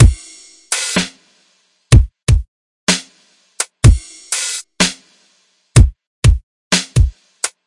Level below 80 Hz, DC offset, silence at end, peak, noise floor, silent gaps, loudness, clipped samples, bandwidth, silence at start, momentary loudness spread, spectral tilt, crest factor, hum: -20 dBFS; under 0.1%; 0.2 s; 0 dBFS; -58 dBFS; 2.23-2.27 s, 2.48-2.87 s, 6.07-6.22 s, 6.43-6.71 s; -16 LUFS; under 0.1%; 11.5 kHz; 0 s; 11 LU; -4 dB/octave; 16 dB; none